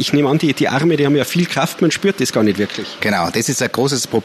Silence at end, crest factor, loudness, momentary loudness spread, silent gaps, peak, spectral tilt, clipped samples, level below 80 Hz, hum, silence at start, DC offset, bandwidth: 0 s; 16 dB; -16 LUFS; 3 LU; none; 0 dBFS; -4.5 dB/octave; under 0.1%; -56 dBFS; none; 0 s; under 0.1%; 14 kHz